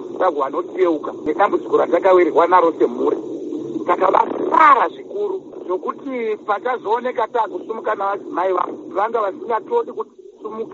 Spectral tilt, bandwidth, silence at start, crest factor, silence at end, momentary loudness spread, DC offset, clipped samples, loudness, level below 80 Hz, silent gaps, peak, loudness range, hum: -3 dB/octave; 7.4 kHz; 0 s; 18 dB; 0 s; 12 LU; under 0.1%; under 0.1%; -18 LUFS; -66 dBFS; none; 0 dBFS; 7 LU; none